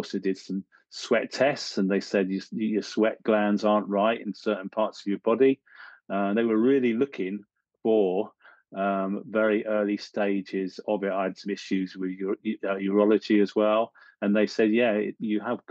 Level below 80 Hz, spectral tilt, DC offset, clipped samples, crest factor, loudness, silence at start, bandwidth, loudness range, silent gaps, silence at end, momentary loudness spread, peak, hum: -82 dBFS; -6 dB/octave; under 0.1%; under 0.1%; 16 dB; -26 LUFS; 0 s; 8.2 kHz; 3 LU; none; 0.1 s; 10 LU; -8 dBFS; none